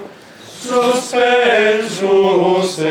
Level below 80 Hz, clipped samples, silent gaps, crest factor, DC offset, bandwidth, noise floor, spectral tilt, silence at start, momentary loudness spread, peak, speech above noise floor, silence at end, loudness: -58 dBFS; under 0.1%; none; 14 dB; under 0.1%; 15.5 kHz; -37 dBFS; -4 dB/octave; 0 s; 5 LU; 0 dBFS; 24 dB; 0 s; -14 LUFS